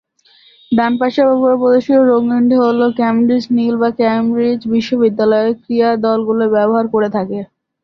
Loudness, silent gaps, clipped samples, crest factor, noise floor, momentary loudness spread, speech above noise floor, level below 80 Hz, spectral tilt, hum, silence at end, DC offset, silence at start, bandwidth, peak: -14 LUFS; none; under 0.1%; 12 dB; -49 dBFS; 5 LU; 37 dB; -56 dBFS; -7.5 dB/octave; none; 0.4 s; under 0.1%; 0.7 s; 6.4 kHz; -2 dBFS